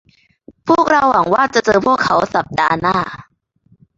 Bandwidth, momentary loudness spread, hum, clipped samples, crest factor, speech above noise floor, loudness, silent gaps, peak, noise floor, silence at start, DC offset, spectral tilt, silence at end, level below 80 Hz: 7.8 kHz; 9 LU; none; under 0.1%; 16 dB; 41 dB; -14 LUFS; none; 0 dBFS; -55 dBFS; 0.65 s; under 0.1%; -5 dB/octave; 0.75 s; -48 dBFS